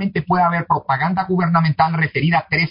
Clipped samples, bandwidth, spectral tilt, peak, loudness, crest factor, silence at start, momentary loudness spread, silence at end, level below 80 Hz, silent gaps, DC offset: under 0.1%; 5.4 kHz; -11.5 dB/octave; -4 dBFS; -17 LUFS; 12 dB; 0 s; 3 LU; 0 s; -50 dBFS; none; under 0.1%